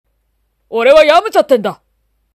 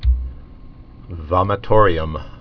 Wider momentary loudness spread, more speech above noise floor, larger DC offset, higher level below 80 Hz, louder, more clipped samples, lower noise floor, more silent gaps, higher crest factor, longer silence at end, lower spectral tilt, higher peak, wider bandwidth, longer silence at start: second, 14 LU vs 19 LU; first, 54 dB vs 22 dB; neither; second, -48 dBFS vs -24 dBFS; first, -10 LUFS vs -18 LUFS; first, 0.3% vs under 0.1%; first, -63 dBFS vs -39 dBFS; neither; second, 12 dB vs 18 dB; first, 0.6 s vs 0.05 s; second, -4 dB/octave vs -9.5 dB/octave; about the same, 0 dBFS vs 0 dBFS; first, 14 kHz vs 5.4 kHz; first, 0.7 s vs 0 s